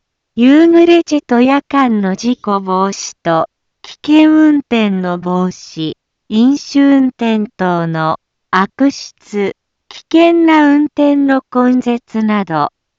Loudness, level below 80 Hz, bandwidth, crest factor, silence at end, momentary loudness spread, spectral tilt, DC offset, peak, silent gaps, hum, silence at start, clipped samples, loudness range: -12 LUFS; -56 dBFS; 7.6 kHz; 12 dB; 0.3 s; 12 LU; -6 dB/octave; under 0.1%; 0 dBFS; none; none; 0.35 s; under 0.1%; 3 LU